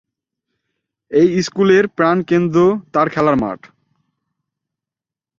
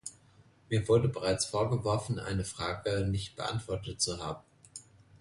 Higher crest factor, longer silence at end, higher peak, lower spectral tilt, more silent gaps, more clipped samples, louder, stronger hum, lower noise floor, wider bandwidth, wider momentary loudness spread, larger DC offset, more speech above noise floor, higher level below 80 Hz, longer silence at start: about the same, 16 dB vs 18 dB; first, 1.85 s vs 0.05 s; first, -2 dBFS vs -14 dBFS; first, -6.5 dB/octave vs -5 dB/octave; neither; neither; first, -15 LUFS vs -32 LUFS; neither; first, -88 dBFS vs -62 dBFS; second, 7.6 kHz vs 11.5 kHz; second, 6 LU vs 18 LU; neither; first, 74 dB vs 30 dB; about the same, -52 dBFS vs -52 dBFS; first, 1.1 s vs 0.05 s